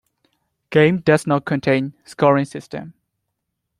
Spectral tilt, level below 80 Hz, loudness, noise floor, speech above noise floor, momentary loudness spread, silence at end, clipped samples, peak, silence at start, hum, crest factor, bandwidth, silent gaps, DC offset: -7 dB/octave; -58 dBFS; -18 LUFS; -77 dBFS; 59 dB; 16 LU; 0.9 s; under 0.1%; -2 dBFS; 0.7 s; none; 18 dB; 12.5 kHz; none; under 0.1%